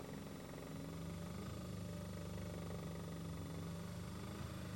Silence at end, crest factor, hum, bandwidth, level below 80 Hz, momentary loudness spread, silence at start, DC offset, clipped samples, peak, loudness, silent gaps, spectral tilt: 0 s; 12 dB; none; 19.5 kHz; -60 dBFS; 3 LU; 0 s; under 0.1%; under 0.1%; -34 dBFS; -49 LUFS; none; -6 dB/octave